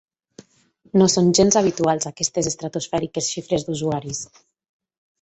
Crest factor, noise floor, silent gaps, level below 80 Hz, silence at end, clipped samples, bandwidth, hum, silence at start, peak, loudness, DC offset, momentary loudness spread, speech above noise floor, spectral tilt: 18 dB; -58 dBFS; none; -54 dBFS; 0.95 s; under 0.1%; 8.4 kHz; none; 0.95 s; -4 dBFS; -20 LUFS; under 0.1%; 11 LU; 38 dB; -4.5 dB/octave